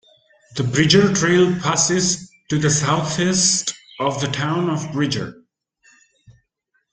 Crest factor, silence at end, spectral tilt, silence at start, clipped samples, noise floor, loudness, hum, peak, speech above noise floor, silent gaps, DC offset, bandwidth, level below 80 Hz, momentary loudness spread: 20 dB; 1.6 s; -3.5 dB/octave; 0.5 s; under 0.1%; -70 dBFS; -18 LUFS; none; 0 dBFS; 52 dB; none; under 0.1%; 10 kHz; -52 dBFS; 11 LU